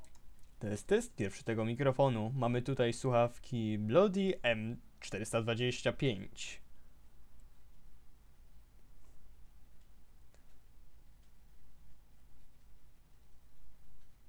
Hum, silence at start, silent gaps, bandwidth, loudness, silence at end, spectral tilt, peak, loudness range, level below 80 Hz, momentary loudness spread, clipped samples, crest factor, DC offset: none; 0 s; none; 15.5 kHz; -35 LUFS; 0 s; -6 dB/octave; -16 dBFS; 10 LU; -58 dBFS; 14 LU; under 0.1%; 22 dB; under 0.1%